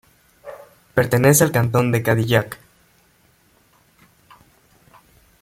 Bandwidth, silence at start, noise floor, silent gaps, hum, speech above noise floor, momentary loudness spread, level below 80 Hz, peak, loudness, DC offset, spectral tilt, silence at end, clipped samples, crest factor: 16.5 kHz; 0.45 s; -58 dBFS; none; none; 41 dB; 25 LU; -52 dBFS; -2 dBFS; -17 LUFS; under 0.1%; -5 dB/octave; 2.85 s; under 0.1%; 20 dB